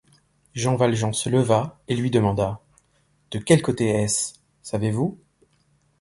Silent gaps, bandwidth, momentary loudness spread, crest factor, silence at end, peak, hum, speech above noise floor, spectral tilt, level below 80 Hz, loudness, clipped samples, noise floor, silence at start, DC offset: none; 11.5 kHz; 12 LU; 20 dB; 0.85 s; -4 dBFS; none; 43 dB; -5.5 dB/octave; -52 dBFS; -23 LUFS; under 0.1%; -64 dBFS; 0.55 s; under 0.1%